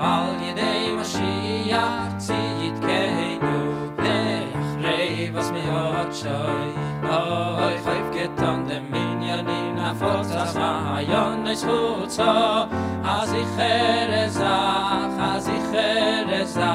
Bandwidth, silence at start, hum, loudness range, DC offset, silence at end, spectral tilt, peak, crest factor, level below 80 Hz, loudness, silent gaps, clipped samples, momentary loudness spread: 16 kHz; 0 s; none; 3 LU; under 0.1%; 0 s; -5 dB/octave; -6 dBFS; 16 dB; -52 dBFS; -23 LUFS; none; under 0.1%; 6 LU